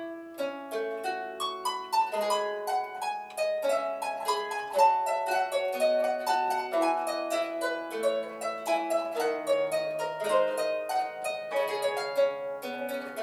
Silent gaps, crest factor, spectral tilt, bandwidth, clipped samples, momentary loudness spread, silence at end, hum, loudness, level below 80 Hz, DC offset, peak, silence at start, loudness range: none; 18 dB; -2 dB/octave; 17.5 kHz; under 0.1%; 8 LU; 0 s; none; -30 LUFS; -78 dBFS; under 0.1%; -10 dBFS; 0 s; 3 LU